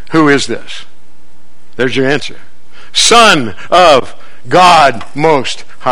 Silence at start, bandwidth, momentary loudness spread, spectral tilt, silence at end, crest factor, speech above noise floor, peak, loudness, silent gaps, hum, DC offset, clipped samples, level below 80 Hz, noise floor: 0.1 s; over 20 kHz; 15 LU; -3 dB/octave; 0 s; 12 dB; 38 dB; 0 dBFS; -9 LUFS; none; none; 10%; 2%; -42 dBFS; -48 dBFS